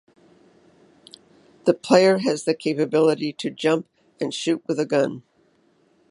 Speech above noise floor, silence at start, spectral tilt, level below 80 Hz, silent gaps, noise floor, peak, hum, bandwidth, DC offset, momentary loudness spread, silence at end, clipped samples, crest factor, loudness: 41 dB; 1.65 s; -5 dB/octave; -74 dBFS; none; -62 dBFS; 0 dBFS; none; 11.5 kHz; under 0.1%; 11 LU; 0.9 s; under 0.1%; 22 dB; -22 LUFS